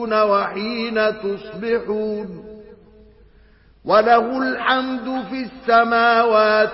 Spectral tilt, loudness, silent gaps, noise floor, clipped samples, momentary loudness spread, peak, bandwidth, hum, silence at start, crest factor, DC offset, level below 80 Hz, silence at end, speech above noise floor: -9 dB/octave; -18 LUFS; none; -51 dBFS; under 0.1%; 13 LU; -2 dBFS; 5.8 kHz; none; 0 s; 16 dB; under 0.1%; -54 dBFS; 0 s; 33 dB